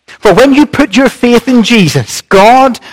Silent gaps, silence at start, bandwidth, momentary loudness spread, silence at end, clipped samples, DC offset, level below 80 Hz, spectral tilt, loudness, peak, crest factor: none; 0.1 s; 16.5 kHz; 5 LU; 0 s; 7%; 2%; -34 dBFS; -5 dB/octave; -6 LUFS; 0 dBFS; 6 dB